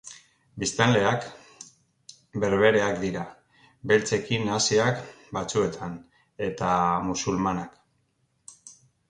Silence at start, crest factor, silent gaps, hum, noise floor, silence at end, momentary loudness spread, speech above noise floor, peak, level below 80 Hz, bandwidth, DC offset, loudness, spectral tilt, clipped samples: 0.05 s; 20 dB; none; none; -71 dBFS; 0.4 s; 22 LU; 46 dB; -6 dBFS; -56 dBFS; 11 kHz; under 0.1%; -25 LUFS; -4.5 dB/octave; under 0.1%